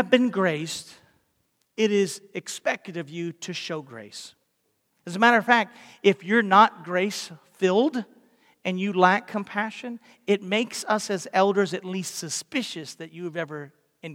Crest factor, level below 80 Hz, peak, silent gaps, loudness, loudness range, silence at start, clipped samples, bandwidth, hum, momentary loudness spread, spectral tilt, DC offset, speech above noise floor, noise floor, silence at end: 22 dB; -78 dBFS; -4 dBFS; none; -24 LUFS; 7 LU; 0 s; under 0.1%; 16.5 kHz; none; 18 LU; -4 dB/octave; under 0.1%; 48 dB; -73 dBFS; 0 s